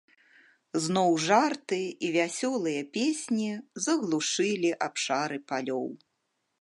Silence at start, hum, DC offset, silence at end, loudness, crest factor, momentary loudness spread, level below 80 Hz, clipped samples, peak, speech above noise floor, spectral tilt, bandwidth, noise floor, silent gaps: 0.75 s; none; under 0.1%; 0.65 s; -28 LUFS; 20 dB; 9 LU; -80 dBFS; under 0.1%; -10 dBFS; 51 dB; -3.5 dB/octave; 11.5 kHz; -79 dBFS; none